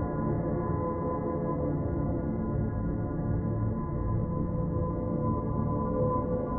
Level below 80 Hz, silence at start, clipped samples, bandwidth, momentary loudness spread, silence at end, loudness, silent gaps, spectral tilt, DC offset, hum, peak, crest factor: -40 dBFS; 0 s; under 0.1%; 2.2 kHz; 3 LU; 0 s; -31 LUFS; none; -13.5 dB/octave; under 0.1%; none; -16 dBFS; 12 dB